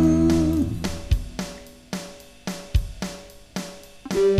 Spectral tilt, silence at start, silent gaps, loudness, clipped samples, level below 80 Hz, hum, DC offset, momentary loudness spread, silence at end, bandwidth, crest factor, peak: -6.5 dB/octave; 0 s; none; -26 LUFS; under 0.1%; -32 dBFS; none; under 0.1%; 19 LU; 0 s; 15.5 kHz; 16 dB; -8 dBFS